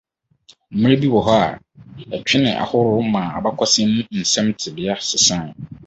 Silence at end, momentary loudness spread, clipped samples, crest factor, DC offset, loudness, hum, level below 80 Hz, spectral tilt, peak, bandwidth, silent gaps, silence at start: 0 s; 11 LU; under 0.1%; 18 dB; under 0.1%; -17 LUFS; none; -50 dBFS; -4 dB/octave; -2 dBFS; 8.2 kHz; none; 0.7 s